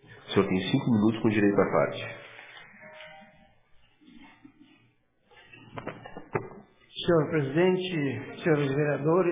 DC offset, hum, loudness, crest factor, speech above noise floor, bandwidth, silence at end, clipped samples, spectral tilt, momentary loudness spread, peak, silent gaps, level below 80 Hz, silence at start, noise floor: under 0.1%; none; -27 LUFS; 20 dB; 42 dB; 3.8 kHz; 0 s; under 0.1%; -11 dB/octave; 22 LU; -8 dBFS; none; -62 dBFS; 0.1 s; -67 dBFS